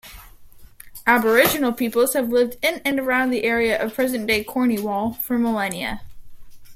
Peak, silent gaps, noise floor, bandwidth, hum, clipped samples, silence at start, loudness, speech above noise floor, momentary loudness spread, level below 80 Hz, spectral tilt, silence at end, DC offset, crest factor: -2 dBFS; none; -43 dBFS; 16.5 kHz; none; under 0.1%; 0.05 s; -20 LUFS; 23 dB; 8 LU; -48 dBFS; -3.5 dB/octave; 0 s; under 0.1%; 20 dB